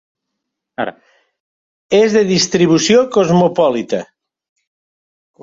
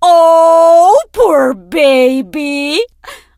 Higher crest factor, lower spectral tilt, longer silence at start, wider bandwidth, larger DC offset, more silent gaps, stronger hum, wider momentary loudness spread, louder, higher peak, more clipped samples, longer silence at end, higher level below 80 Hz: first, 16 dB vs 8 dB; first, -4.5 dB/octave vs -3 dB/octave; first, 0.8 s vs 0 s; second, 7.8 kHz vs 15.5 kHz; neither; first, 1.40-1.89 s vs none; neither; about the same, 13 LU vs 11 LU; second, -14 LUFS vs -9 LUFS; about the same, 0 dBFS vs 0 dBFS; second, under 0.1% vs 0.2%; first, 1.4 s vs 0.25 s; second, -54 dBFS vs -46 dBFS